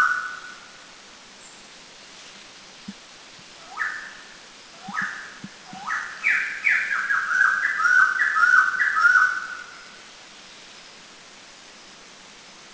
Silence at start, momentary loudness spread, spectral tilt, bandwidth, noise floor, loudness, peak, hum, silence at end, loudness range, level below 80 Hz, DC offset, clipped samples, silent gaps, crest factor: 0 s; 26 LU; -0.5 dB/octave; 8 kHz; -46 dBFS; -20 LUFS; -6 dBFS; none; 0 s; 21 LU; -68 dBFS; under 0.1%; under 0.1%; none; 20 dB